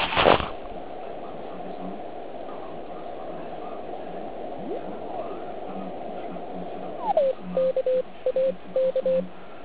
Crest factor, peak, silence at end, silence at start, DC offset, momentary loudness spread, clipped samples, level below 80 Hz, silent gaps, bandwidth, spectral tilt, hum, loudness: 28 dB; -2 dBFS; 0 s; 0 s; 1%; 14 LU; under 0.1%; -52 dBFS; none; 4 kHz; -9 dB/octave; none; -29 LUFS